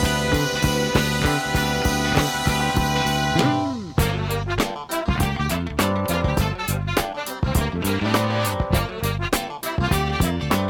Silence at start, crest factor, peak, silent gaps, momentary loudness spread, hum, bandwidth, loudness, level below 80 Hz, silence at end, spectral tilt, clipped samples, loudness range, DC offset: 0 s; 18 dB; -4 dBFS; none; 5 LU; none; 19.5 kHz; -22 LUFS; -32 dBFS; 0 s; -4.5 dB/octave; under 0.1%; 3 LU; under 0.1%